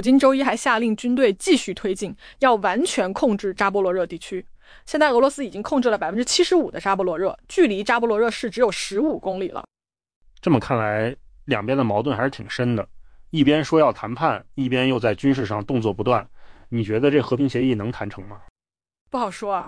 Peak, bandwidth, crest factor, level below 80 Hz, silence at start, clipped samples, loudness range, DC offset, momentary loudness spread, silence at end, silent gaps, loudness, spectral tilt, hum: -6 dBFS; 10.5 kHz; 16 dB; -50 dBFS; 0 s; under 0.1%; 3 LU; under 0.1%; 11 LU; 0 s; 10.16-10.21 s, 18.50-18.56 s, 19.01-19.06 s; -21 LUFS; -5 dB/octave; none